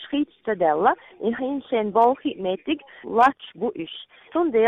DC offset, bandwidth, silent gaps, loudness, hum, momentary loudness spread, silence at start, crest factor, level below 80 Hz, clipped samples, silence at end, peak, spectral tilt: under 0.1%; 9.2 kHz; none; -23 LUFS; none; 10 LU; 0 s; 18 dB; -64 dBFS; under 0.1%; 0 s; -6 dBFS; -6.5 dB/octave